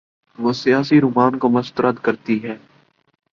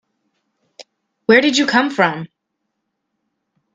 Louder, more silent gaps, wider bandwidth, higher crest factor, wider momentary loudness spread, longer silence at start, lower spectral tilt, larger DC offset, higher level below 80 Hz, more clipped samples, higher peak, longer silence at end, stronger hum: second, -18 LUFS vs -15 LUFS; neither; second, 7.2 kHz vs 9.4 kHz; about the same, 16 dB vs 20 dB; second, 9 LU vs 17 LU; second, 0.4 s vs 0.8 s; first, -7 dB/octave vs -4 dB/octave; neither; first, -60 dBFS vs -66 dBFS; neither; about the same, -2 dBFS vs 0 dBFS; second, 0.75 s vs 1.5 s; neither